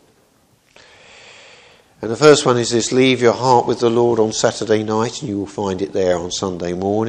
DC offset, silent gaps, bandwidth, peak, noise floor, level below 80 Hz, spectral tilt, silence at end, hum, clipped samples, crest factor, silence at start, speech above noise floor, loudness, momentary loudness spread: under 0.1%; none; 10.5 kHz; 0 dBFS; -56 dBFS; -54 dBFS; -4.5 dB/octave; 0 s; none; under 0.1%; 18 dB; 1.3 s; 40 dB; -16 LUFS; 10 LU